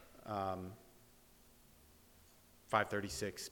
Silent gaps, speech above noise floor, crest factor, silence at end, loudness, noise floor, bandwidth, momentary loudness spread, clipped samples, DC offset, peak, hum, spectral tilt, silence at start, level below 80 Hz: none; 26 dB; 28 dB; 0 s; -40 LUFS; -65 dBFS; 19 kHz; 14 LU; under 0.1%; under 0.1%; -16 dBFS; none; -4 dB/octave; 0 s; -68 dBFS